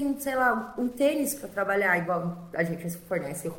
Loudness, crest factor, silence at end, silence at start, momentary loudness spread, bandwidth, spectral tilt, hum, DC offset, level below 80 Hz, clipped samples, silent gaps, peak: -28 LUFS; 18 dB; 0 s; 0 s; 8 LU; 17 kHz; -5 dB/octave; none; under 0.1%; -60 dBFS; under 0.1%; none; -10 dBFS